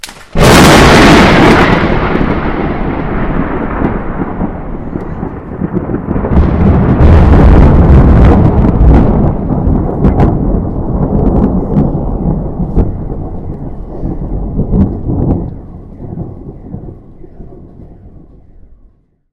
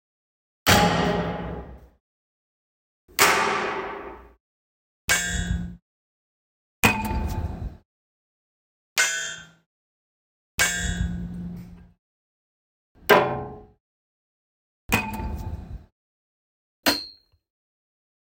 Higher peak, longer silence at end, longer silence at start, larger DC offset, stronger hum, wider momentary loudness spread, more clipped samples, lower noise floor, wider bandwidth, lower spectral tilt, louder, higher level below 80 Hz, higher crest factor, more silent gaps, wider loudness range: about the same, 0 dBFS vs 0 dBFS; first, 1.25 s vs 1.1 s; second, 0.05 s vs 0.65 s; neither; neither; about the same, 19 LU vs 20 LU; first, 0.8% vs under 0.1%; about the same, -45 dBFS vs -45 dBFS; about the same, 16 kHz vs 16.5 kHz; first, -6.5 dB/octave vs -3 dB/octave; first, -9 LUFS vs -24 LUFS; first, -14 dBFS vs -40 dBFS; second, 8 dB vs 28 dB; second, none vs 2.00-3.08 s, 4.40-5.08 s, 5.82-6.83 s, 7.85-8.96 s, 9.66-10.58 s, 11.99-12.95 s, 13.80-14.89 s, 15.92-16.83 s; first, 11 LU vs 5 LU